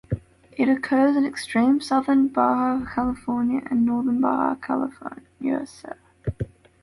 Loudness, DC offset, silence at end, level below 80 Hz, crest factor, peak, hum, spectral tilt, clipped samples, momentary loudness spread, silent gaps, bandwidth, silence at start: -23 LUFS; under 0.1%; 0.35 s; -48 dBFS; 14 dB; -8 dBFS; none; -6.5 dB/octave; under 0.1%; 15 LU; none; 11.5 kHz; 0.1 s